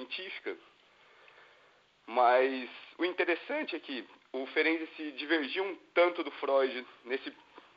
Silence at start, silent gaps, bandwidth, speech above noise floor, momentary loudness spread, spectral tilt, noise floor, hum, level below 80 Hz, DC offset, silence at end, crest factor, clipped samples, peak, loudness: 0 s; none; 5.6 kHz; 32 dB; 14 LU; 1 dB/octave; -65 dBFS; none; -88 dBFS; under 0.1%; 0.15 s; 20 dB; under 0.1%; -14 dBFS; -32 LUFS